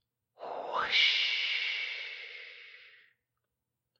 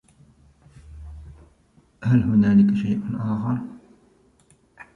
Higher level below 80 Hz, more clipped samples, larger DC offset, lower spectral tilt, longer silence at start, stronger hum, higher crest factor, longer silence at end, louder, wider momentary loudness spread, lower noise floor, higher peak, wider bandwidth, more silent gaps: second, -80 dBFS vs -48 dBFS; neither; neither; second, 0.5 dB/octave vs -9.5 dB/octave; second, 0.4 s vs 0.9 s; neither; about the same, 22 dB vs 18 dB; first, 1.1 s vs 0.1 s; second, -29 LUFS vs -21 LUFS; about the same, 23 LU vs 25 LU; first, -87 dBFS vs -59 dBFS; second, -14 dBFS vs -6 dBFS; first, 8.2 kHz vs 4.5 kHz; neither